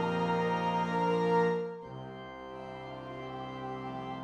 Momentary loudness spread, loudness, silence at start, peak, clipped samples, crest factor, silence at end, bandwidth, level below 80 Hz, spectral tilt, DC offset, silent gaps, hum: 16 LU; -33 LUFS; 0 s; -18 dBFS; under 0.1%; 16 dB; 0 s; 8.8 kHz; -64 dBFS; -7 dB/octave; under 0.1%; none; none